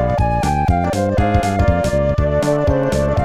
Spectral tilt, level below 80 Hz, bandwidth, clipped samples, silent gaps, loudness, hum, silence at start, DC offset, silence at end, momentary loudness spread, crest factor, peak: -7 dB/octave; -24 dBFS; 14 kHz; under 0.1%; none; -17 LUFS; none; 0 s; 0.5%; 0 s; 1 LU; 14 dB; -2 dBFS